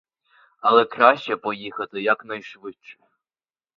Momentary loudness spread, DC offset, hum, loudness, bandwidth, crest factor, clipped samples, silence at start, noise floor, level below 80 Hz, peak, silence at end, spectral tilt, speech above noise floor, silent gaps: 20 LU; under 0.1%; none; -20 LUFS; 6.8 kHz; 22 dB; under 0.1%; 0.65 s; under -90 dBFS; -72 dBFS; 0 dBFS; 0.85 s; -5.5 dB/octave; over 68 dB; none